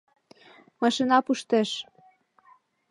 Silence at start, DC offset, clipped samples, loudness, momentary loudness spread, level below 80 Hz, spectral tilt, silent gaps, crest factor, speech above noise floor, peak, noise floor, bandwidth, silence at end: 0.8 s; under 0.1%; under 0.1%; -25 LUFS; 12 LU; -76 dBFS; -4 dB/octave; none; 20 dB; 36 dB; -8 dBFS; -60 dBFS; 11.5 kHz; 1.1 s